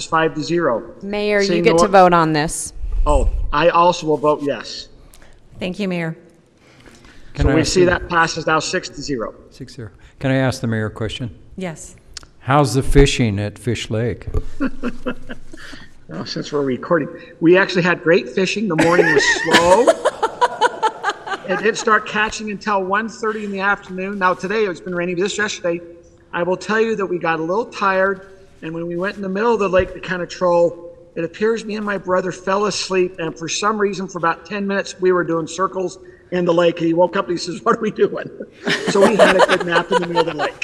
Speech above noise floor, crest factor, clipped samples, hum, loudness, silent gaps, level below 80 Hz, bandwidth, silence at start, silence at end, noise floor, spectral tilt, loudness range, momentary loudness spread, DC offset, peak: 32 dB; 18 dB; under 0.1%; none; -18 LUFS; none; -32 dBFS; 13.5 kHz; 0 s; 0.05 s; -50 dBFS; -5 dB/octave; 7 LU; 16 LU; under 0.1%; 0 dBFS